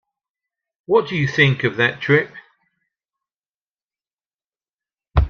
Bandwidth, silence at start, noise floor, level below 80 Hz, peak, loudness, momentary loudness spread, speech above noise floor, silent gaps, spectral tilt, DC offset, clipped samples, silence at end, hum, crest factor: 6.8 kHz; 0.9 s; under -90 dBFS; -34 dBFS; -2 dBFS; -18 LUFS; 6 LU; over 72 dB; 3.05-3.09 s, 3.36-3.40 s, 3.48-3.67 s, 3.84-3.89 s, 4.13-4.18 s, 4.34-4.39 s, 4.46-4.50 s, 4.74-4.78 s; -6.5 dB/octave; under 0.1%; under 0.1%; 0 s; none; 20 dB